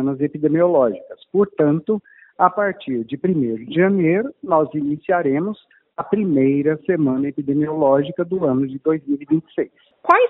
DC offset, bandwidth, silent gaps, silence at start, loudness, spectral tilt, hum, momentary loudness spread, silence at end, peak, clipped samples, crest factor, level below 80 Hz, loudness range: under 0.1%; 4.1 kHz; none; 0 s; -19 LUFS; -7 dB/octave; none; 9 LU; 0 s; 0 dBFS; under 0.1%; 18 dB; -62 dBFS; 1 LU